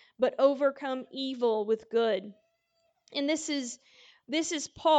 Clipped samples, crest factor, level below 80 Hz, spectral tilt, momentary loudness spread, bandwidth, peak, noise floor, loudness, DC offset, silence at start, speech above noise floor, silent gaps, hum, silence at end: under 0.1%; 18 dB; -74 dBFS; -2.5 dB/octave; 11 LU; 9.4 kHz; -12 dBFS; -75 dBFS; -30 LUFS; under 0.1%; 0.2 s; 46 dB; none; none; 0 s